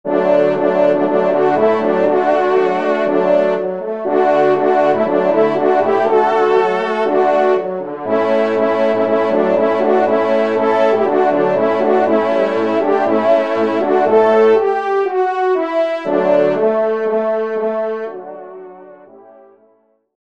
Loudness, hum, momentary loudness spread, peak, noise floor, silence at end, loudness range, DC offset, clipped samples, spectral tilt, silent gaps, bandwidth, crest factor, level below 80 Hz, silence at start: -14 LUFS; none; 5 LU; -2 dBFS; -56 dBFS; 1.3 s; 3 LU; 0.6%; under 0.1%; -7 dB/octave; none; 7.6 kHz; 12 dB; -64 dBFS; 0.05 s